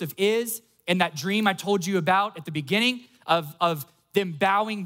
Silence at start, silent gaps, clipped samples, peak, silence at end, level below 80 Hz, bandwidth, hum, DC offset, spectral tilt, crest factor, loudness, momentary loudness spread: 0 s; none; under 0.1%; -8 dBFS; 0 s; -74 dBFS; 16.5 kHz; none; under 0.1%; -4.5 dB/octave; 18 dB; -25 LUFS; 8 LU